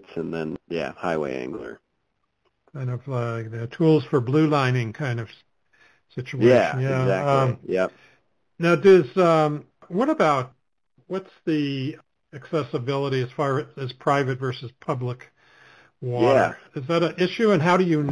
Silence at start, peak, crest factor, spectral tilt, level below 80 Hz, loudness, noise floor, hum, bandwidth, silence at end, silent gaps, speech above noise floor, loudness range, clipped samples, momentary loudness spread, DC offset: 0.1 s; -6 dBFS; 18 dB; -7.5 dB/octave; -62 dBFS; -23 LUFS; -75 dBFS; none; 11 kHz; 0 s; none; 53 dB; 7 LU; under 0.1%; 15 LU; under 0.1%